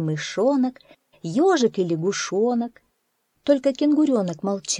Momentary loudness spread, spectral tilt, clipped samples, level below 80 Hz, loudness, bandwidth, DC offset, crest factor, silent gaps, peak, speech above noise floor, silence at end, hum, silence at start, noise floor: 8 LU; -5 dB/octave; under 0.1%; -70 dBFS; -22 LUFS; 11 kHz; under 0.1%; 16 dB; none; -6 dBFS; 50 dB; 0 s; none; 0 s; -72 dBFS